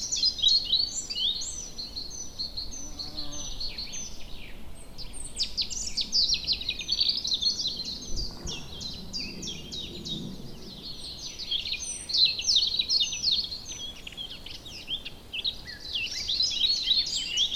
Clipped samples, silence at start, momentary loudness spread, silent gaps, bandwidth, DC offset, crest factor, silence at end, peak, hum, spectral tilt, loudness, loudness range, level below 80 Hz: under 0.1%; 0 s; 17 LU; none; 16 kHz; under 0.1%; 20 dB; 0 s; -10 dBFS; none; -0.5 dB/octave; -27 LUFS; 10 LU; -48 dBFS